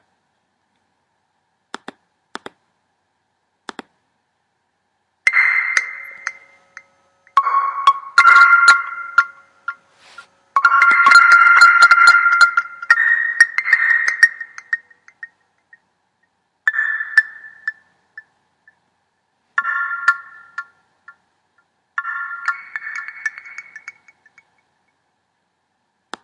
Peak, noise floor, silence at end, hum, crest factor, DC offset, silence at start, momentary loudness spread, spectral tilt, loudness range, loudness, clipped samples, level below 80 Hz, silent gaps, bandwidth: 0 dBFS; -69 dBFS; 2.35 s; none; 18 dB; under 0.1%; 5.25 s; 25 LU; 2 dB/octave; 18 LU; -13 LUFS; under 0.1%; -76 dBFS; none; 11 kHz